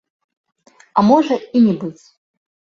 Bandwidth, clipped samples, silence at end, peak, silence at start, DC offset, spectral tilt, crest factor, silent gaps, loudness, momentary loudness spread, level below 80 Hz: 7.4 kHz; under 0.1%; 0.85 s; -2 dBFS; 0.95 s; under 0.1%; -7.5 dB/octave; 18 dB; none; -15 LUFS; 11 LU; -60 dBFS